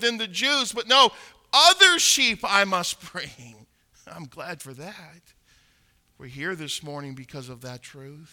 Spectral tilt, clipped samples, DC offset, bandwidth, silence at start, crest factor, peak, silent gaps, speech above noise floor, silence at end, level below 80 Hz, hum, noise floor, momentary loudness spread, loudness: -1 dB/octave; under 0.1%; under 0.1%; 19 kHz; 0 s; 22 dB; -2 dBFS; none; 40 dB; 0.1 s; -64 dBFS; none; -64 dBFS; 25 LU; -19 LUFS